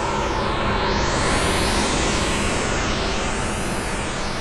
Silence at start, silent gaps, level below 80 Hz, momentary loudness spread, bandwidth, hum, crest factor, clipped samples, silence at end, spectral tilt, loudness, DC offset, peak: 0 s; none; -30 dBFS; 5 LU; 13.5 kHz; none; 14 dB; under 0.1%; 0 s; -3.5 dB/octave; -21 LUFS; under 0.1%; -8 dBFS